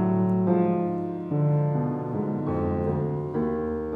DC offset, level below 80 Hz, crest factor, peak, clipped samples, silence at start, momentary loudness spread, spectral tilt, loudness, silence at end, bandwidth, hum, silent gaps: under 0.1%; -48 dBFS; 14 dB; -12 dBFS; under 0.1%; 0 s; 6 LU; -12 dB/octave; -26 LUFS; 0 s; 3.6 kHz; none; none